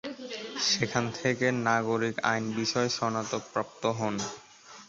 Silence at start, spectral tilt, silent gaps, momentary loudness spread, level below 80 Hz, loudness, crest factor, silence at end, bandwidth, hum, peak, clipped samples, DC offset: 0.05 s; -3.5 dB/octave; none; 11 LU; -66 dBFS; -29 LUFS; 20 dB; 0.05 s; 8 kHz; none; -10 dBFS; under 0.1%; under 0.1%